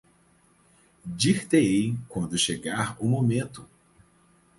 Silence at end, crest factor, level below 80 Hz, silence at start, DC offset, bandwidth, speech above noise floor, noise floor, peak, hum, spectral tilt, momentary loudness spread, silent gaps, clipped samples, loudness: 0.95 s; 20 dB; -58 dBFS; 1.05 s; under 0.1%; 11.5 kHz; 37 dB; -62 dBFS; -8 dBFS; none; -5 dB/octave; 17 LU; none; under 0.1%; -25 LUFS